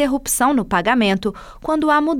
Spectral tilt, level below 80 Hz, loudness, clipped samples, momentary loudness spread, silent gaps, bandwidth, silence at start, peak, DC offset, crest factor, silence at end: -4 dB/octave; -42 dBFS; -18 LUFS; under 0.1%; 8 LU; none; 18 kHz; 0 s; -4 dBFS; under 0.1%; 14 dB; 0 s